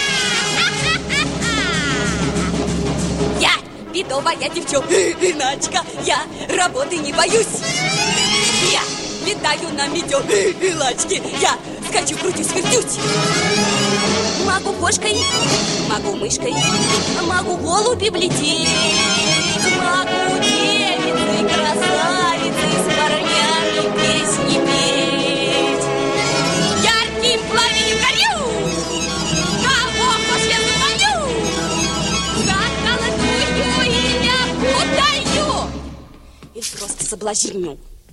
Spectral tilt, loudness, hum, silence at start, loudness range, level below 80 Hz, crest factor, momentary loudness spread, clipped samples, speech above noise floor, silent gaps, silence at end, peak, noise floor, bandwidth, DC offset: -2.5 dB/octave; -16 LUFS; none; 0 s; 3 LU; -38 dBFS; 16 dB; 6 LU; under 0.1%; 23 dB; none; 0.15 s; -2 dBFS; -41 dBFS; 16 kHz; under 0.1%